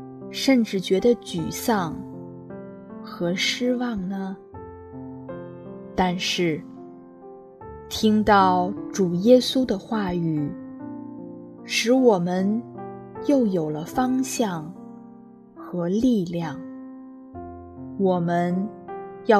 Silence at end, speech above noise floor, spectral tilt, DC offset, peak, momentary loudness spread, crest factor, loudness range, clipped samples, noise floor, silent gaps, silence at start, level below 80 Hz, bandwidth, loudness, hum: 0 s; 24 dB; -5.5 dB/octave; under 0.1%; -4 dBFS; 22 LU; 20 dB; 7 LU; under 0.1%; -46 dBFS; none; 0 s; -54 dBFS; 14 kHz; -23 LUFS; none